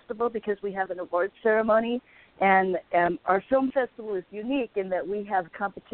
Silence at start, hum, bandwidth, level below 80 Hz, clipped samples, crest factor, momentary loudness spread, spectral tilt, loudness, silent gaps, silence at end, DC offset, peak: 0.1 s; none; 4.3 kHz; -62 dBFS; under 0.1%; 18 dB; 10 LU; -10 dB/octave; -26 LUFS; none; 0.15 s; under 0.1%; -8 dBFS